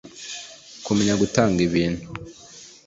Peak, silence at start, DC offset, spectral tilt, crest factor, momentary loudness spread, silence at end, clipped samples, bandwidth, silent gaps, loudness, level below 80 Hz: -2 dBFS; 0.05 s; under 0.1%; -5 dB/octave; 22 dB; 21 LU; 0.2 s; under 0.1%; 8 kHz; none; -21 LUFS; -48 dBFS